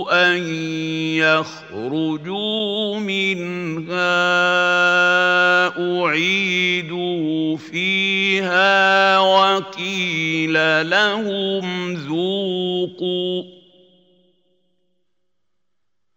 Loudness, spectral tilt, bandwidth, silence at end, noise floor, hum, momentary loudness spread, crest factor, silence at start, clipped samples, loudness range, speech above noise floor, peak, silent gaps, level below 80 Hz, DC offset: -18 LUFS; -4.5 dB/octave; 16 kHz; 2.65 s; -81 dBFS; none; 10 LU; 18 dB; 0 s; under 0.1%; 9 LU; 62 dB; -2 dBFS; none; -74 dBFS; under 0.1%